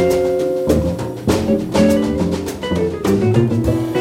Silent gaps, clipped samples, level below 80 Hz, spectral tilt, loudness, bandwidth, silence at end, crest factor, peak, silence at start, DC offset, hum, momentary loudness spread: none; under 0.1%; -34 dBFS; -7 dB/octave; -17 LUFS; 16.5 kHz; 0 s; 14 dB; -2 dBFS; 0 s; under 0.1%; none; 6 LU